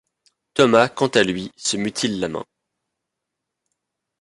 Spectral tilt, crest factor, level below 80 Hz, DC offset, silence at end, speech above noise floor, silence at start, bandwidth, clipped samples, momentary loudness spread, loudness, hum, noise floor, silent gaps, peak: -4 dB/octave; 22 dB; -58 dBFS; under 0.1%; 1.75 s; 62 dB; 0.55 s; 11.5 kHz; under 0.1%; 12 LU; -20 LUFS; none; -82 dBFS; none; -2 dBFS